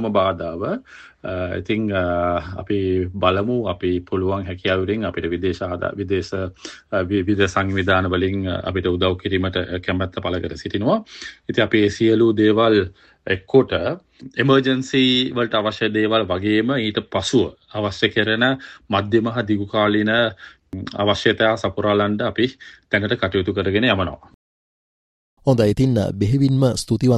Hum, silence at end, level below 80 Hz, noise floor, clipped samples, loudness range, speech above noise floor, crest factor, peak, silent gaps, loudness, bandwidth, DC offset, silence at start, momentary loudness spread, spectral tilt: none; 0 s; -50 dBFS; under -90 dBFS; under 0.1%; 4 LU; over 70 dB; 18 dB; -2 dBFS; 24.34-25.37 s; -20 LUFS; 12 kHz; under 0.1%; 0 s; 9 LU; -6 dB/octave